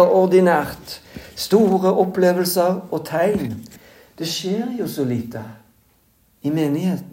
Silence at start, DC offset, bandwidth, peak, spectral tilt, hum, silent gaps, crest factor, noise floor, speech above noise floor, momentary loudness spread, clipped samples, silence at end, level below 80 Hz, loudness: 0 s; under 0.1%; 16.5 kHz; -2 dBFS; -5.5 dB/octave; none; none; 18 dB; -59 dBFS; 40 dB; 19 LU; under 0.1%; 0 s; -54 dBFS; -19 LUFS